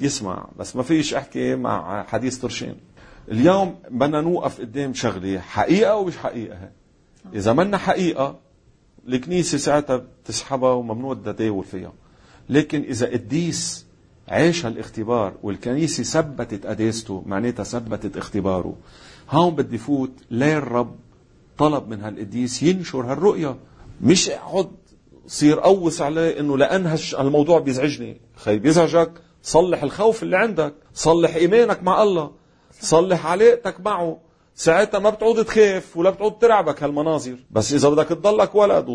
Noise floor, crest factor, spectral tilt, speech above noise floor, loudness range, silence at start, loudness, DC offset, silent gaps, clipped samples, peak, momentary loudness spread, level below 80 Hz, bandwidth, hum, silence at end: -56 dBFS; 18 dB; -5 dB/octave; 36 dB; 6 LU; 0 s; -20 LUFS; under 0.1%; none; under 0.1%; -2 dBFS; 12 LU; -50 dBFS; 10.5 kHz; none; 0 s